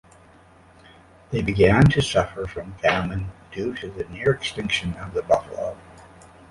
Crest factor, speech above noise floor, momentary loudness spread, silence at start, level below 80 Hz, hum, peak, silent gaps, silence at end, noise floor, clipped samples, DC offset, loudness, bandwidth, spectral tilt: 20 dB; 29 dB; 15 LU; 1.3 s; -40 dBFS; none; -4 dBFS; none; 0.45 s; -51 dBFS; under 0.1%; under 0.1%; -23 LUFS; 11.5 kHz; -6 dB/octave